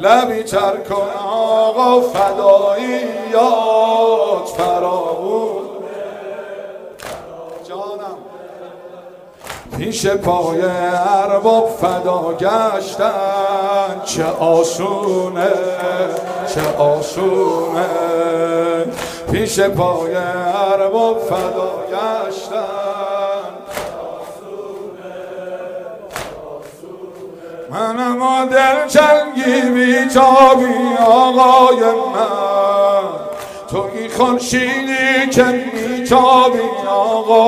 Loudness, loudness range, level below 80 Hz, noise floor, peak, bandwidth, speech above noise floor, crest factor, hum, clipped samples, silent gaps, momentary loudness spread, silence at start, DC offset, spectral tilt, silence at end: -14 LUFS; 15 LU; -50 dBFS; -37 dBFS; 0 dBFS; 16 kHz; 24 dB; 14 dB; none; under 0.1%; none; 19 LU; 0 s; under 0.1%; -4.5 dB/octave; 0 s